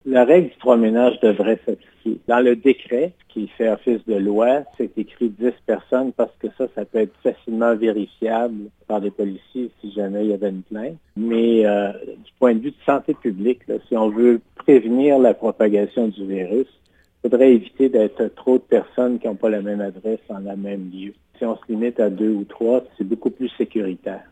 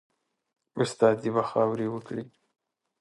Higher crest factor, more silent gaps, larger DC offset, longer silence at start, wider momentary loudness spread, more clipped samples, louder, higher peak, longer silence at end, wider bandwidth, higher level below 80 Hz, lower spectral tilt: about the same, 18 dB vs 22 dB; neither; neither; second, 0.05 s vs 0.75 s; about the same, 13 LU vs 15 LU; neither; first, -20 LUFS vs -27 LUFS; first, 0 dBFS vs -8 dBFS; second, 0.15 s vs 0.7 s; second, 8.8 kHz vs 11.5 kHz; first, -62 dBFS vs -72 dBFS; first, -8 dB/octave vs -6 dB/octave